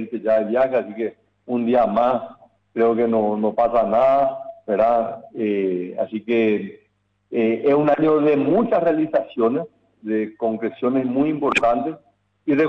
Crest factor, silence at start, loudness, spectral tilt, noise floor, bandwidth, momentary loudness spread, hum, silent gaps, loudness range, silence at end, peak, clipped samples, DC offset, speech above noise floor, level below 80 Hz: 12 dB; 0 s; -20 LUFS; -7.5 dB/octave; -57 dBFS; 9.2 kHz; 11 LU; none; none; 3 LU; 0 s; -8 dBFS; under 0.1%; under 0.1%; 38 dB; -58 dBFS